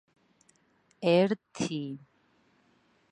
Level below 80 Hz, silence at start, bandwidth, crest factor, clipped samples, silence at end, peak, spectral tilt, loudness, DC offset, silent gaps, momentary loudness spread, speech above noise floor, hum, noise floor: -74 dBFS; 1 s; 11 kHz; 22 dB; under 0.1%; 1.15 s; -12 dBFS; -6 dB/octave; -29 LUFS; under 0.1%; none; 16 LU; 40 dB; none; -68 dBFS